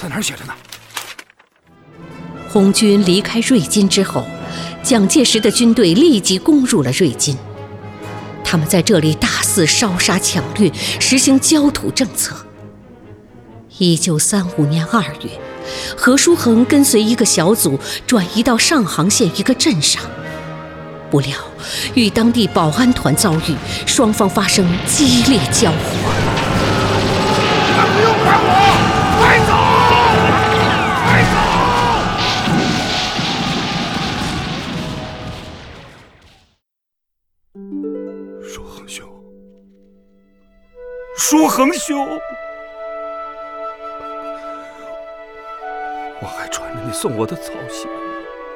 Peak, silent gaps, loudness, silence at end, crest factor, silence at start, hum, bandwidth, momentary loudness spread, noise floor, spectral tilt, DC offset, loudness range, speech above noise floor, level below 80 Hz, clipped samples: 0 dBFS; none; -14 LUFS; 0 s; 16 dB; 0 s; none; 18.5 kHz; 19 LU; -78 dBFS; -4 dB/octave; under 0.1%; 17 LU; 65 dB; -38 dBFS; under 0.1%